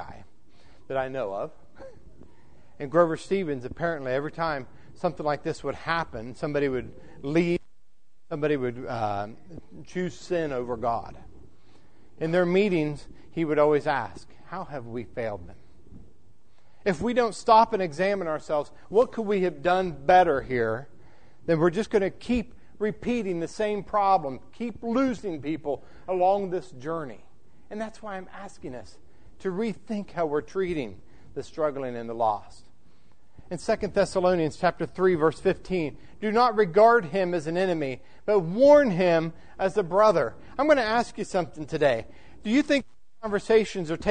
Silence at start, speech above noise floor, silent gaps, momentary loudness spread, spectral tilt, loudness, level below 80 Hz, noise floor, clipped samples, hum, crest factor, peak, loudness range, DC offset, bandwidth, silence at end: 0 s; 41 dB; none; 16 LU; -6.5 dB/octave; -26 LUFS; -54 dBFS; -67 dBFS; under 0.1%; none; 20 dB; -6 dBFS; 9 LU; 0.7%; 9.6 kHz; 0 s